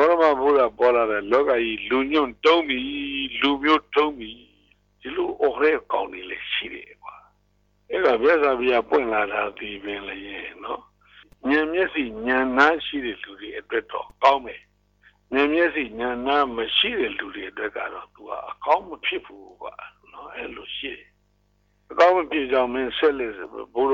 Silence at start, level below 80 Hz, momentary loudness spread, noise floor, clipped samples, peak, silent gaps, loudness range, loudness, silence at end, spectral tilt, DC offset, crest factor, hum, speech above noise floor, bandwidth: 0 s; -56 dBFS; 17 LU; -65 dBFS; under 0.1%; -4 dBFS; none; 7 LU; -22 LUFS; 0 s; -4.5 dB/octave; under 0.1%; 20 dB; 50 Hz at -55 dBFS; 42 dB; 7.4 kHz